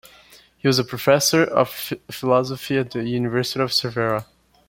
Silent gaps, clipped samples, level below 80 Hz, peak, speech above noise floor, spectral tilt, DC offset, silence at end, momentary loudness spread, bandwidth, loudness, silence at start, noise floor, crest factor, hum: none; under 0.1%; -58 dBFS; -2 dBFS; 30 dB; -4 dB/octave; under 0.1%; 0.45 s; 8 LU; 17 kHz; -21 LUFS; 0.65 s; -51 dBFS; 20 dB; none